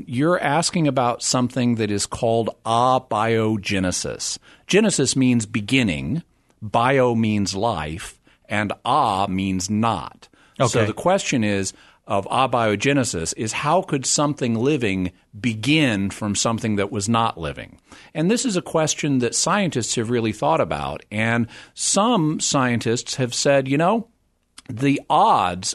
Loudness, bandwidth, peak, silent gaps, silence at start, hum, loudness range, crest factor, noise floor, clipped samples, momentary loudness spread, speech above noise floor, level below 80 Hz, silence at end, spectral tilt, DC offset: -21 LUFS; 12.5 kHz; -4 dBFS; none; 0 s; none; 2 LU; 18 dB; -51 dBFS; under 0.1%; 9 LU; 30 dB; -50 dBFS; 0 s; -4.5 dB/octave; under 0.1%